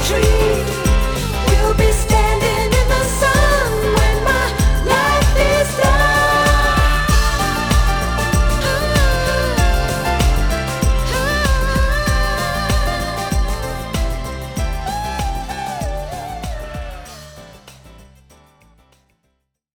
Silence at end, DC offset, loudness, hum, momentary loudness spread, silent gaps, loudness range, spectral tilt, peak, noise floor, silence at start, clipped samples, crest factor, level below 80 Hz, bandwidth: 1.7 s; under 0.1%; -17 LUFS; none; 11 LU; none; 12 LU; -4.5 dB/octave; 0 dBFS; -68 dBFS; 0 s; under 0.1%; 16 dB; -20 dBFS; over 20 kHz